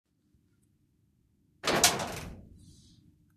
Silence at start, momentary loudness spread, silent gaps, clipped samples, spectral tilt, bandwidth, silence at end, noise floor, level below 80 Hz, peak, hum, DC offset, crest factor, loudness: 1.65 s; 19 LU; none; under 0.1%; -1.5 dB/octave; 14.5 kHz; 0.65 s; -70 dBFS; -58 dBFS; -8 dBFS; none; under 0.1%; 28 dB; -27 LUFS